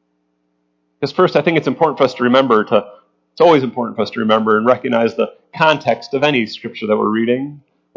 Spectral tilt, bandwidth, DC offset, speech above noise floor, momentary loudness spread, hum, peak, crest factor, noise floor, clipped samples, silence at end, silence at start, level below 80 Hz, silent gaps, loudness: -6.5 dB/octave; 7.4 kHz; under 0.1%; 51 dB; 9 LU; none; 0 dBFS; 16 dB; -66 dBFS; under 0.1%; 0.4 s; 1 s; -64 dBFS; none; -15 LUFS